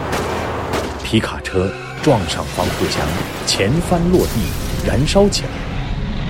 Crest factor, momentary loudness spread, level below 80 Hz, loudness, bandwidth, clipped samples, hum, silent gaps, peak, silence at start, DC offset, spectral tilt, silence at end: 16 dB; 7 LU; -28 dBFS; -18 LUFS; 16.5 kHz; under 0.1%; none; none; -2 dBFS; 0 s; under 0.1%; -5 dB/octave; 0 s